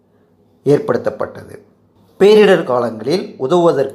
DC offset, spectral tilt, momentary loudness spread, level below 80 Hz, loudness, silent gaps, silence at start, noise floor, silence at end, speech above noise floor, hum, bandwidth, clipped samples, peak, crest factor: under 0.1%; -6.5 dB/octave; 13 LU; -62 dBFS; -14 LUFS; none; 0.65 s; -54 dBFS; 0 s; 40 dB; none; 12.5 kHz; under 0.1%; 0 dBFS; 14 dB